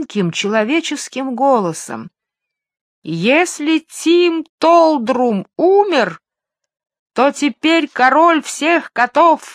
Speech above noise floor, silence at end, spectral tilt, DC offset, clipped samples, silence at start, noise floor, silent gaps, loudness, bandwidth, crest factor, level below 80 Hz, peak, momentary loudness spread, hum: 67 dB; 0 s; -4 dB/octave; under 0.1%; under 0.1%; 0 s; -82 dBFS; 2.81-3.02 s, 4.49-4.58 s, 6.99-7.06 s; -14 LUFS; 14 kHz; 16 dB; -72 dBFS; 0 dBFS; 11 LU; none